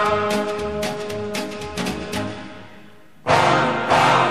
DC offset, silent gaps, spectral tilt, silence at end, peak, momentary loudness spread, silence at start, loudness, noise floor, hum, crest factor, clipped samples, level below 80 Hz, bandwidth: 0.7%; none; -4.5 dB/octave; 0 s; -2 dBFS; 15 LU; 0 s; -21 LUFS; -47 dBFS; none; 18 dB; under 0.1%; -46 dBFS; 15.5 kHz